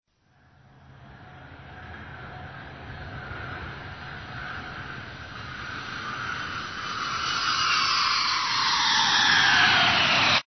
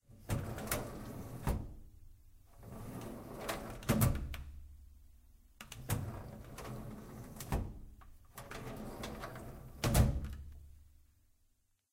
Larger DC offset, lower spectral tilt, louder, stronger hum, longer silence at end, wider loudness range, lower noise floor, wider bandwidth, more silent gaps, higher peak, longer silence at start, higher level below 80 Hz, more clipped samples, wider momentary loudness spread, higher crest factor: neither; second, -1.5 dB/octave vs -5.5 dB/octave; first, -22 LUFS vs -40 LUFS; neither; second, 0.05 s vs 0.9 s; first, 20 LU vs 7 LU; second, -62 dBFS vs -75 dBFS; second, 6.4 kHz vs 16.5 kHz; neither; first, -8 dBFS vs -14 dBFS; first, 0.95 s vs 0.1 s; second, -52 dBFS vs -46 dBFS; neither; about the same, 22 LU vs 23 LU; second, 20 dB vs 26 dB